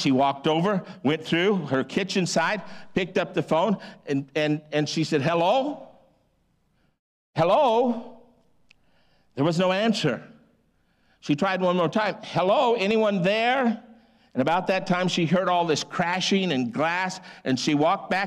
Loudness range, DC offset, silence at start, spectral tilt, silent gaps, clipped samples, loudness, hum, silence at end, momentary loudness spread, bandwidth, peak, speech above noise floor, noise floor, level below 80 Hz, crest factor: 4 LU; under 0.1%; 0 s; -5 dB/octave; 6.99-7.33 s; under 0.1%; -24 LUFS; none; 0 s; 8 LU; 12.5 kHz; -12 dBFS; 44 dB; -67 dBFS; -64 dBFS; 12 dB